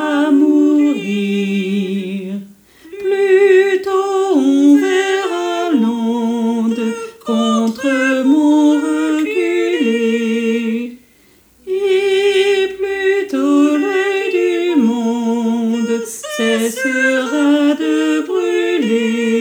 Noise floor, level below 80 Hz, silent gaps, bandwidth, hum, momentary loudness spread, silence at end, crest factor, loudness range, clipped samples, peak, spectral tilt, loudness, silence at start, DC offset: -50 dBFS; -62 dBFS; none; over 20 kHz; none; 8 LU; 0 s; 14 dB; 3 LU; under 0.1%; -2 dBFS; -5 dB/octave; -15 LUFS; 0 s; under 0.1%